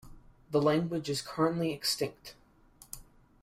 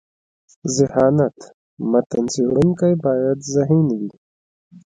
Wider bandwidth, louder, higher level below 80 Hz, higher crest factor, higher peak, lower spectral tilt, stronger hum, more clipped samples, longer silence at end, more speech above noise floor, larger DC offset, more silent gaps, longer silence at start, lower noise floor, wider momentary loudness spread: first, 16 kHz vs 9.6 kHz; second, -31 LUFS vs -18 LUFS; second, -60 dBFS vs -52 dBFS; about the same, 18 dB vs 16 dB; second, -16 dBFS vs -2 dBFS; second, -5 dB/octave vs -7 dB/octave; neither; neither; first, 0.4 s vs 0.05 s; second, 29 dB vs over 72 dB; neither; second, none vs 1.54-1.77 s, 2.06-2.10 s, 4.18-4.71 s; second, 0.05 s vs 0.65 s; second, -59 dBFS vs under -90 dBFS; first, 20 LU vs 9 LU